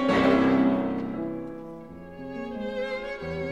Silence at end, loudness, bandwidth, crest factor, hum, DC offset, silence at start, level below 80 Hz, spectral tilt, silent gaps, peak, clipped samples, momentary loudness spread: 0 s; -26 LUFS; 8 kHz; 18 dB; none; 0.2%; 0 s; -54 dBFS; -7 dB/octave; none; -8 dBFS; under 0.1%; 20 LU